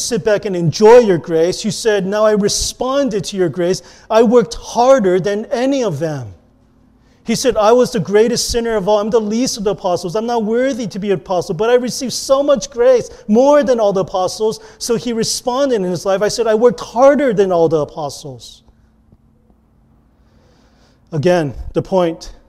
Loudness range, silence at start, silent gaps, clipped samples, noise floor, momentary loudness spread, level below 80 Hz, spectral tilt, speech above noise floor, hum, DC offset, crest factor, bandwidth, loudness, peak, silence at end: 7 LU; 0 s; none; under 0.1%; -52 dBFS; 9 LU; -42 dBFS; -4.5 dB/octave; 38 dB; none; under 0.1%; 14 dB; 14.5 kHz; -15 LUFS; 0 dBFS; 0.2 s